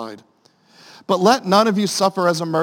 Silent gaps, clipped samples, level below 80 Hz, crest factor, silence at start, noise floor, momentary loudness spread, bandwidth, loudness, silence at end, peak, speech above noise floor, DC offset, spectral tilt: none; under 0.1%; -70 dBFS; 18 dB; 0 s; -53 dBFS; 12 LU; 17 kHz; -17 LUFS; 0 s; 0 dBFS; 36 dB; under 0.1%; -4.5 dB/octave